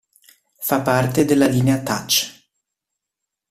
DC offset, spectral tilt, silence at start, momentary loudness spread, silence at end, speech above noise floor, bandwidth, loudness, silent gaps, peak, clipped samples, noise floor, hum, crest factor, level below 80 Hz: under 0.1%; -4.5 dB/octave; 0.6 s; 7 LU; 1.2 s; 65 dB; 16 kHz; -18 LUFS; none; -2 dBFS; under 0.1%; -83 dBFS; none; 18 dB; -52 dBFS